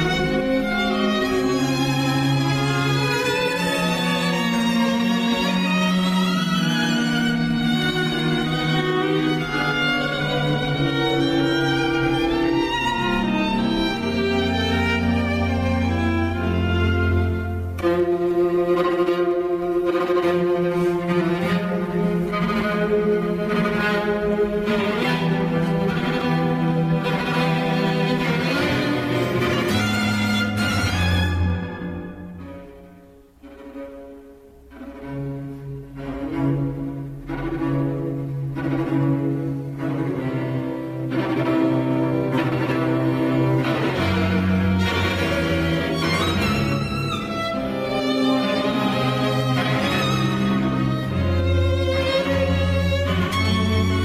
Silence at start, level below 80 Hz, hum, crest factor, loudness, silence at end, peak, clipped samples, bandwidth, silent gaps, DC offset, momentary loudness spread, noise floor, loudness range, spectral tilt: 0 s; -40 dBFS; none; 12 dB; -21 LUFS; 0 s; -8 dBFS; under 0.1%; 15.5 kHz; none; under 0.1%; 6 LU; -47 dBFS; 6 LU; -6 dB/octave